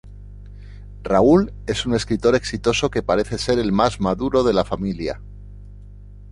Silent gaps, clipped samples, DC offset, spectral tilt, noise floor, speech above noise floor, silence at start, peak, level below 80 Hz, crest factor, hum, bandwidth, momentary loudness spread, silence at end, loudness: none; under 0.1%; under 0.1%; -5.5 dB/octave; -40 dBFS; 21 dB; 0.05 s; -2 dBFS; -38 dBFS; 18 dB; 50 Hz at -35 dBFS; 11.5 kHz; 15 LU; 0 s; -20 LUFS